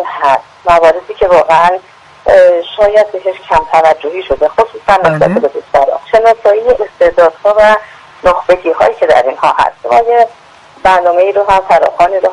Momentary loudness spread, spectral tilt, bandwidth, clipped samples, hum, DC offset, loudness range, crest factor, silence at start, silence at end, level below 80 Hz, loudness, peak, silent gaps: 6 LU; -5 dB/octave; 11 kHz; 0.7%; none; under 0.1%; 1 LU; 10 dB; 0 s; 0 s; -38 dBFS; -9 LUFS; 0 dBFS; none